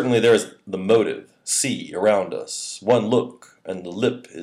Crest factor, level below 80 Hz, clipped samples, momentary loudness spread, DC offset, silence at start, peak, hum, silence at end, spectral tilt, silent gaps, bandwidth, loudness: 18 dB; -70 dBFS; under 0.1%; 14 LU; under 0.1%; 0 s; -4 dBFS; none; 0 s; -4 dB/octave; none; 15.5 kHz; -21 LUFS